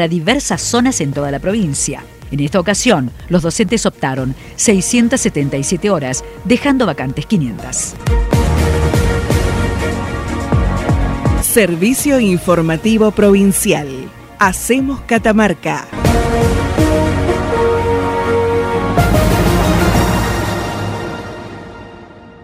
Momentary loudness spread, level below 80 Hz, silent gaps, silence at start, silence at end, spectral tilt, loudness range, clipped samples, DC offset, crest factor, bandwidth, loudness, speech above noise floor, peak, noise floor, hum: 9 LU; -24 dBFS; none; 0 s; 0.1 s; -5 dB/octave; 3 LU; under 0.1%; under 0.1%; 14 dB; 16 kHz; -14 LUFS; 22 dB; 0 dBFS; -36 dBFS; none